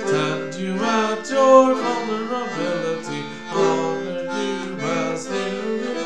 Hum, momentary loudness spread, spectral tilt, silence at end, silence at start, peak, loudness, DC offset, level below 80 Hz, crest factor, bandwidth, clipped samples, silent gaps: none; 12 LU; -5 dB/octave; 0 s; 0 s; 0 dBFS; -21 LUFS; 0.7%; -66 dBFS; 20 dB; 10 kHz; under 0.1%; none